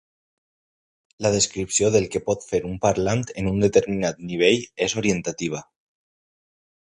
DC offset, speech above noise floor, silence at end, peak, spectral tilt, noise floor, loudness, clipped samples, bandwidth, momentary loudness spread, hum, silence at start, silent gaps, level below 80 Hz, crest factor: under 0.1%; over 68 dB; 1.3 s; -4 dBFS; -4 dB/octave; under -90 dBFS; -22 LUFS; under 0.1%; 11 kHz; 7 LU; none; 1.2 s; none; -48 dBFS; 20 dB